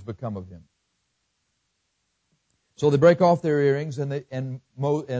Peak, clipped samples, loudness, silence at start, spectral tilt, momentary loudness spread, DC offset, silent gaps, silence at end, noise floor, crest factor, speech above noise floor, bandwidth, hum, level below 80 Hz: -6 dBFS; under 0.1%; -22 LUFS; 0 s; -7.5 dB/octave; 17 LU; under 0.1%; none; 0 s; -74 dBFS; 18 dB; 52 dB; 8 kHz; none; -60 dBFS